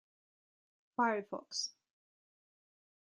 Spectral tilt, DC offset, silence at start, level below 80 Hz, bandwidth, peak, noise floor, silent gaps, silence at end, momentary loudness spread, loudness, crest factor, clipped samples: -2 dB/octave; under 0.1%; 1 s; -88 dBFS; 11 kHz; -20 dBFS; under -90 dBFS; none; 1.35 s; 9 LU; -38 LUFS; 22 dB; under 0.1%